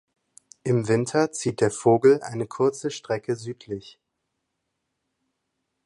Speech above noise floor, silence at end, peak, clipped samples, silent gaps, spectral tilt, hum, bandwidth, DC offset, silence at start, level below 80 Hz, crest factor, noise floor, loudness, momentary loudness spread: 56 dB; 1.95 s; -6 dBFS; under 0.1%; none; -6 dB/octave; none; 11.5 kHz; under 0.1%; 0.65 s; -62 dBFS; 18 dB; -79 dBFS; -24 LUFS; 16 LU